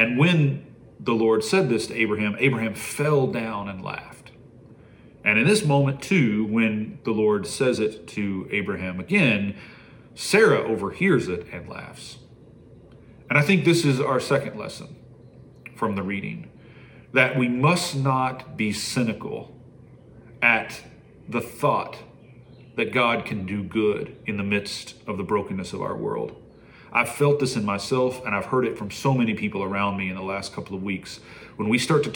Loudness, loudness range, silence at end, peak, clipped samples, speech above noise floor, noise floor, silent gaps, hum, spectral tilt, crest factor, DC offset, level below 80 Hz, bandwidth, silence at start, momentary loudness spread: -23 LUFS; 4 LU; 0 s; -2 dBFS; under 0.1%; 26 dB; -49 dBFS; none; none; -5.5 dB/octave; 22 dB; under 0.1%; -60 dBFS; 18 kHz; 0 s; 15 LU